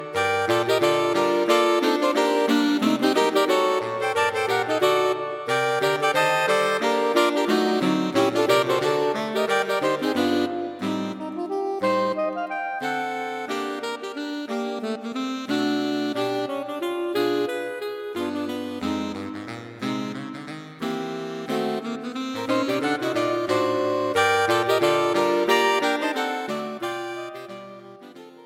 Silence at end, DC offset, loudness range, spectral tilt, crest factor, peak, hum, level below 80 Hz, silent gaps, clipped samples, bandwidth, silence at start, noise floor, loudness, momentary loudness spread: 0 s; under 0.1%; 8 LU; -4 dB/octave; 18 dB; -6 dBFS; none; -70 dBFS; none; under 0.1%; 16.5 kHz; 0 s; -44 dBFS; -23 LUFS; 11 LU